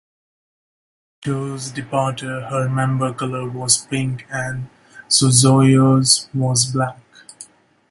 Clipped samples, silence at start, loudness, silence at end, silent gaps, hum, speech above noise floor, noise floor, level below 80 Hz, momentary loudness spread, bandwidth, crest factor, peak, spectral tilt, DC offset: under 0.1%; 1.2 s; -17 LUFS; 0.45 s; none; none; 27 dB; -44 dBFS; -54 dBFS; 15 LU; 11.5 kHz; 20 dB; 0 dBFS; -4 dB/octave; under 0.1%